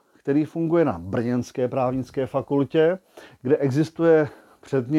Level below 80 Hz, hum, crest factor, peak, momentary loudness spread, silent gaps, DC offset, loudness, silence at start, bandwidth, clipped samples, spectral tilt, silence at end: -58 dBFS; none; 16 dB; -6 dBFS; 8 LU; none; under 0.1%; -23 LUFS; 0.25 s; 12 kHz; under 0.1%; -8 dB/octave; 0 s